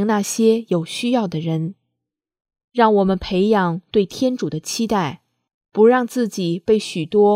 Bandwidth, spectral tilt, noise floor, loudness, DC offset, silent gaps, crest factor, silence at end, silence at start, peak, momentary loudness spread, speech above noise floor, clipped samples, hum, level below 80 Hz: 15.5 kHz; -5.5 dB/octave; -81 dBFS; -19 LUFS; under 0.1%; 2.64-2.68 s, 5.54-5.61 s; 16 dB; 0 s; 0 s; -2 dBFS; 9 LU; 63 dB; under 0.1%; none; -52 dBFS